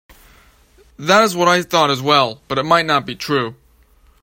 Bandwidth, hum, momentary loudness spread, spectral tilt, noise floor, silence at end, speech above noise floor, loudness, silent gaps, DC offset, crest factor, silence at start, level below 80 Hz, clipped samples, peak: 16.5 kHz; none; 8 LU; -4 dB/octave; -52 dBFS; 0.7 s; 36 dB; -16 LUFS; none; under 0.1%; 18 dB; 1 s; -52 dBFS; under 0.1%; 0 dBFS